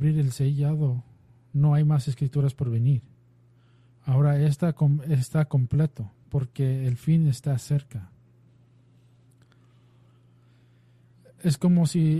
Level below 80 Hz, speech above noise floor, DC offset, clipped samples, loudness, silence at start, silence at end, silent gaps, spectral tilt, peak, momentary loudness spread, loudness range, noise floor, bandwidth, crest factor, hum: -56 dBFS; 35 dB; under 0.1%; under 0.1%; -25 LUFS; 0 s; 0 s; none; -8 dB/octave; -12 dBFS; 9 LU; 7 LU; -58 dBFS; 12.5 kHz; 12 dB; none